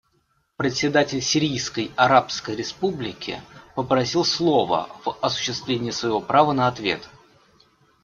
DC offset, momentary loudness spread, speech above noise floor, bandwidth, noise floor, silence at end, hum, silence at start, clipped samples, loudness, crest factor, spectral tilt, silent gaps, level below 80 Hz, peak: under 0.1%; 12 LU; 45 dB; 7.6 kHz; -67 dBFS; 0.95 s; none; 0.6 s; under 0.1%; -22 LUFS; 20 dB; -4 dB/octave; none; -58 dBFS; -2 dBFS